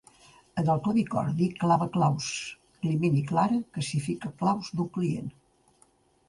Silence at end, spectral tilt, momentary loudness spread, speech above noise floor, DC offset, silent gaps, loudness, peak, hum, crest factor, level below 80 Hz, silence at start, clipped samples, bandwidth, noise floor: 1 s; -6.5 dB/octave; 9 LU; 37 dB; under 0.1%; none; -28 LUFS; -12 dBFS; none; 16 dB; -62 dBFS; 0.55 s; under 0.1%; 11.5 kHz; -64 dBFS